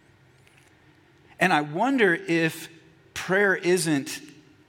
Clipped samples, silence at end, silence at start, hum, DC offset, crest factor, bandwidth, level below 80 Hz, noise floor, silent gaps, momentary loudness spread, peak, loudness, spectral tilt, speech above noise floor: under 0.1%; 0.4 s; 1.4 s; none; under 0.1%; 20 dB; 17 kHz; -68 dBFS; -57 dBFS; none; 16 LU; -6 dBFS; -23 LUFS; -4.5 dB/octave; 34 dB